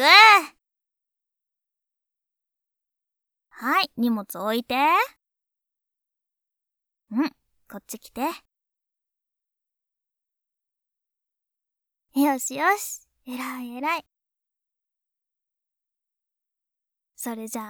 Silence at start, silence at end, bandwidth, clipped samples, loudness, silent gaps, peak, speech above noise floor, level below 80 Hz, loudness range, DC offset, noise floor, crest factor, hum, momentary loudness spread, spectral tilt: 0 s; 0 s; over 20 kHz; under 0.1%; -21 LUFS; none; 0 dBFS; 62 dB; -74 dBFS; 12 LU; under 0.1%; -87 dBFS; 26 dB; none; 19 LU; -1.5 dB/octave